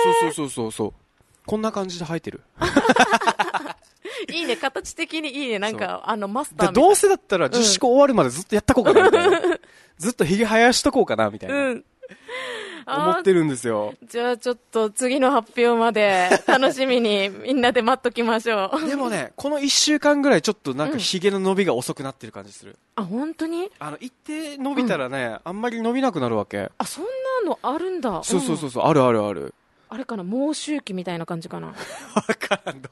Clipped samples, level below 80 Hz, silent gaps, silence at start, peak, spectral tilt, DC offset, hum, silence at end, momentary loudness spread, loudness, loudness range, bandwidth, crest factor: under 0.1%; -52 dBFS; none; 0 s; 0 dBFS; -4 dB/octave; under 0.1%; none; 0.05 s; 15 LU; -21 LUFS; 8 LU; 12.5 kHz; 20 dB